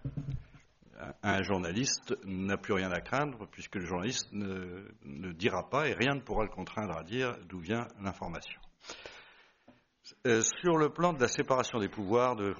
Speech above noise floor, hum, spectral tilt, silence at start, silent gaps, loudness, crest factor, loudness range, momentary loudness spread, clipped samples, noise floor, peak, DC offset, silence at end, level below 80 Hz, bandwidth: 31 dB; none; -4 dB/octave; 0 s; none; -33 LUFS; 22 dB; 7 LU; 17 LU; under 0.1%; -64 dBFS; -12 dBFS; under 0.1%; 0 s; -54 dBFS; 7.2 kHz